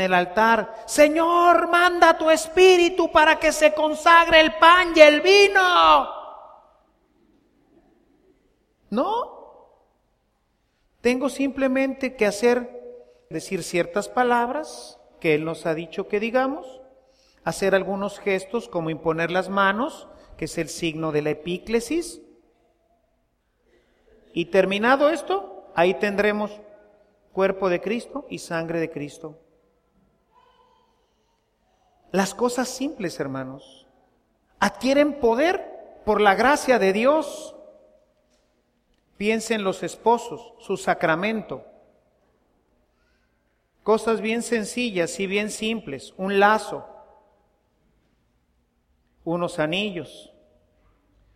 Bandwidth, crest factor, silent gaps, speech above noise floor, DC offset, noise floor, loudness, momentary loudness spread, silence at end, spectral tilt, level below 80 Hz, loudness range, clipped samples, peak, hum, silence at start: 15.5 kHz; 22 dB; none; 48 dB; under 0.1%; -69 dBFS; -21 LUFS; 18 LU; 1.15 s; -4 dB/octave; -54 dBFS; 15 LU; under 0.1%; 0 dBFS; none; 0 s